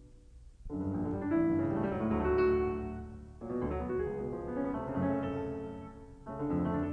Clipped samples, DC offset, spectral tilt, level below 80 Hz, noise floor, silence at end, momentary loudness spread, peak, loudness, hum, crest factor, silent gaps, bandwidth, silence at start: under 0.1%; under 0.1%; -10 dB/octave; -48 dBFS; -54 dBFS; 0 s; 16 LU; -20 dBFS; -34 LUFS; none; 14 dB; none; 6.2 kHz; 0 s